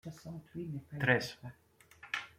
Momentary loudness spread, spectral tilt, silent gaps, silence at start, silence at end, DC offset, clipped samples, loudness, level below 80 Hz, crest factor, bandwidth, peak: 21 LU; -5.5 dB/octave; none; 0.05 s; 0.1 s; under 0.1%; under 0.1%; -36 LUFS; -70 dBFS; 24 dB; 16.5 kHz; -14 dBFS